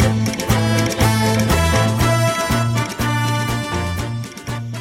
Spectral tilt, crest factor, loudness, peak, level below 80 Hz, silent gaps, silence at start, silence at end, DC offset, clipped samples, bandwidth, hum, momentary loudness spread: -5 dB/octave; 14 dB; -18 LUFS; -2 dBFS; -30 dBFS; none; 0 s; 0 s; under 0.1%; under 0.1%; 16.5 kHz; none; 10 LU